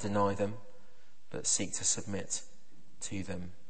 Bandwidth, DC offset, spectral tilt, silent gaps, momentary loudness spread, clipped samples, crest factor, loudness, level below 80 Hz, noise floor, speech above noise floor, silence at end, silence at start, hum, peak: 8.8 kHz; 1%; -3 dB/octave; none; 13 LU; under 0.1%; 20 dB; -34 LUFS; -64 dBFS; -66 dBFS; 31 dB; 0.2 s; 0 s; none; -16 dBFS